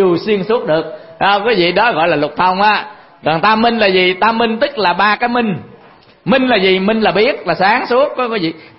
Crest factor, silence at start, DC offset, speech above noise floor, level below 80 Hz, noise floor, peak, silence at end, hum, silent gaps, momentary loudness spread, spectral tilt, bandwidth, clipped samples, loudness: 14 dB; 0 s; under 0.1%; 31 dB; -50 dBFS; -44 dBFS; 0 dBFS; 0.15 s; none; none; 7 LU; -9 dB/octave; 5.8 kHz; under 0.1%; -13 LUFS